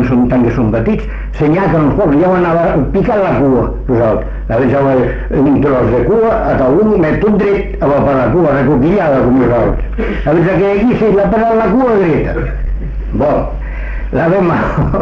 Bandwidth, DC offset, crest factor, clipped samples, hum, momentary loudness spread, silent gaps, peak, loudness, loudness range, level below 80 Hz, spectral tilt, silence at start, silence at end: 6.8 kHz; under 0.1%; 8 dB; under 0.1%; none; 8 LU; none; -2 dBFS; -12 LUFS; 2 LU; -22 dBFS; -10 dB/octave; 0 s; 0 s